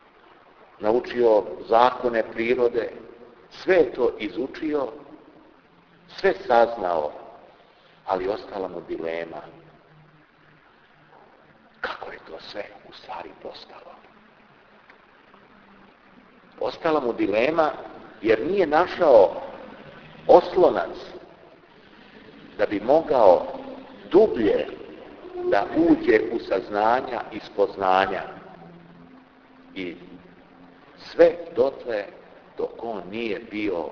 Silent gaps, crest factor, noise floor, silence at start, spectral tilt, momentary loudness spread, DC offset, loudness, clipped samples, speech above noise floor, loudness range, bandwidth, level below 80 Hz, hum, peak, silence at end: none; 24 dB; -55 dBFS; 0.8 s; -6.5 dB/octave; 23 LU; under 0.1%; -22 LUFS; under 0.1%; 33 dB; 17 LU; 5.4 kHz; -56 dBFS; none; 0 dBFS; 0 s